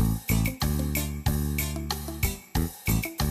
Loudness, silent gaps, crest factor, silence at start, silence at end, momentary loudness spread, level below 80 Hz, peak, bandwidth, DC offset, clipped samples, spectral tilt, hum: -28 LUFS; none; 16 dB; 0 s; 0 s; 4 LU; -32 dBFS; -12 dBFS; 15.5 kHz; under 0.1%; under 0.1%; -5 dB/octave; none